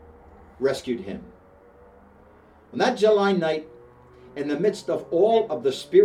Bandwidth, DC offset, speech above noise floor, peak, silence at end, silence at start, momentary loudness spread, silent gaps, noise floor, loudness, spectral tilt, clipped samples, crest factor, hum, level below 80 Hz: 12 kHz; under 0.1%; 31 dB; -4 dBFS; 0 s; 0.6 s; 15 LU; none; -52 dBFS; -23 LUFS; -5.5 dB/octave; under 0.1%; 20 dB; none; -58 dBFS